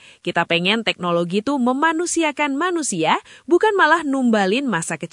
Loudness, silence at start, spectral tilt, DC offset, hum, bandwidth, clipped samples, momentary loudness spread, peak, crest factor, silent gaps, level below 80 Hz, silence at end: -19 LUFS; 0.25 s; -3.5 dB/octave; under 0.1%; none; 11 kHz; under 0.1%; 6 LU; -2 dBFS; 16 dB; none; -66 dBFS; 0.05 s